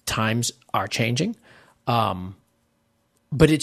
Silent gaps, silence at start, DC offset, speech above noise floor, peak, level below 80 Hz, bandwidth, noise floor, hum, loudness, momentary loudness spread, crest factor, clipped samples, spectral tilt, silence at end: none; 0.05 s; under 0.1%; 46 dB; 0 dBFS; -46 dBFS; 13.5 kHz; -68 dBFS; none; -24 LUFS; 13 LU; 24 dB; under 0.1%; -5 dB/octave; 0 s